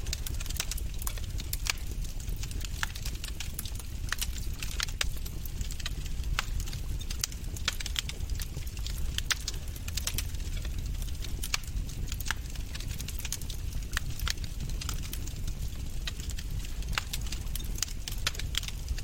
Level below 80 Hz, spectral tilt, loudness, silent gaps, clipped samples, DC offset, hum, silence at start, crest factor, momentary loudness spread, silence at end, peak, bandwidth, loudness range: -36 dBFS; -2.5 dB/octave; -36 LUFS; none; under 0.1%; under 0.1%; none; 0 s; 26 dB; 6 LU; 0 s; -8 dBFS; 17.5 kHz; 2 LU